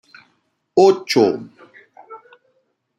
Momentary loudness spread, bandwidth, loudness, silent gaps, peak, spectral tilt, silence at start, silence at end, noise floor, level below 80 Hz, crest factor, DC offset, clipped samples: 8 LU; 12.5 kHz; -16 LUFS; none; -2 dBFS; -5 dB/octave; 0.75 s; 0.8 s; -66 dBFS; -66 dBFS; 18 dB; under 0.1%; under 0.1%